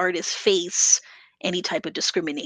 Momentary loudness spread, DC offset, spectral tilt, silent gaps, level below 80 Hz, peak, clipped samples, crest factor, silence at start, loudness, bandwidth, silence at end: 10 LU; under 0.1%; -1 dB/octave; none; -70 dBFS; -4 dBFS; under 0.1%; 20 dB; 0 s; -22 LUFS; 11 kHz; 0 s